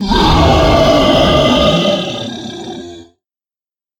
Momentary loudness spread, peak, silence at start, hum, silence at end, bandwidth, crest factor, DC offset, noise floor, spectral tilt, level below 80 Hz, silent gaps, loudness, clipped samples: 16 LU; 0 dBFS; 0 s; none; 0.95 s; 17.5 kHz; 12 dB; under 0.1%; under -90 dBFS; -5.5 dB/octave; -24 dBFS; none; -10 LUFS; under 0.1%